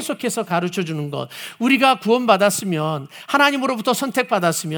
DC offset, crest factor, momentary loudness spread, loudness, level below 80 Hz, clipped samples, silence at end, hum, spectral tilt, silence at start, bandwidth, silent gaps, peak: under 0.1%; 20 dB; 11 LU; -19 LUFS; -72 dBFS; under 0.1%; 0 s; none; -4 dB/octave; 0 s; over 20 kHz; none; 0 dBFS